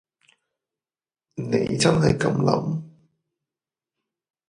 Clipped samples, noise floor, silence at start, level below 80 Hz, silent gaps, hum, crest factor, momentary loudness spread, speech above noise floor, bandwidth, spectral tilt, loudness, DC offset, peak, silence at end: under 0.1%; under -90 dBFS; 1.35 s; -52 dBFS; none; none; 22 dB; 14 LU; over 69 dB; 11 kHz; -5.5 dB/octave; -22 LUFS; under 0.1%; -4 dBFS; 1.6 s